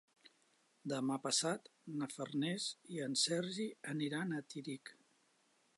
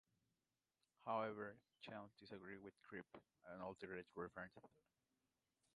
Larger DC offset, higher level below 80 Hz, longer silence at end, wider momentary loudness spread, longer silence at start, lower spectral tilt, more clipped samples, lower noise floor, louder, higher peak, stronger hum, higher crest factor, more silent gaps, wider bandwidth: neither; second, under -90 dBFS vs -84 dBFS; second, 0.85 s vs 1.1 s; second, 12 LU vs 15 LU; second, 0.85 s vs 1 s; second, -3.5 dB/octave vs -6.5 dB/octave; neither; second, -76 dBFS vs under -90 dBFS; first, -40 LUFS vs -53 LUFS; first, -20 dBFS vs -32 dBFS; neither; about the same, 20 dB vs 24 dB; neither; about the same, 11.5 kHz vs 10.5 kHz